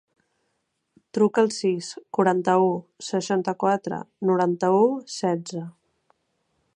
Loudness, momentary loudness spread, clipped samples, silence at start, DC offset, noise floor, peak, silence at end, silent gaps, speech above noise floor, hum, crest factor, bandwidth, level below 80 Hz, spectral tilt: -23 LUFS; 12 LU; under 0.1%; 1.15 s; under 0.1%; -75 dBFS; -6 dBFS; 1.05 s; none; 52 dB; none; 18 dB; 10.5 kHz; -74 dBFS; -5.5 dB/octave